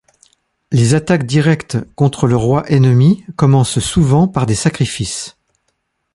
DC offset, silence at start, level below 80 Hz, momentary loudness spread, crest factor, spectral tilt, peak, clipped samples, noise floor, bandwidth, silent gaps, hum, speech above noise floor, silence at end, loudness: under 0.1%; 0.7 s; -38 dBFS; 7 LU; 12 dB; -6 dB/octave; -2 dBFS; under 0.1%; -68 dBFS; 11.5 kHz; none; none; 55 dB; 0.85 s; -14 LUFS